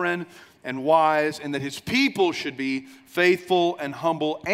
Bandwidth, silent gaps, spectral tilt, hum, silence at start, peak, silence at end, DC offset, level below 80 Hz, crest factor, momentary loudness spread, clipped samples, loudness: 16 kHz; none; -5 dB/octave; none; 0 s; -6 dBFS; 0 s; under 0.1%; -64 dBFS; 18 dB; 12 LU; under 0.1%; -23 LUFS